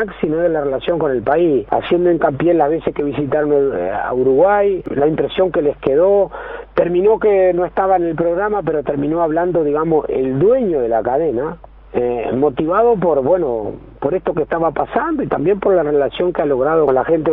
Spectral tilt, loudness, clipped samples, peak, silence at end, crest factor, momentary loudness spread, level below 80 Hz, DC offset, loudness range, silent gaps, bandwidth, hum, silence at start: -6 dB/octave; -16 LUFS; under 0.1%; 0 dBFS; 0 s; 14 dB; 6 LU; -42 dBFS; under 0.1%; 2 LU; none; 4 kHz; none; 0 s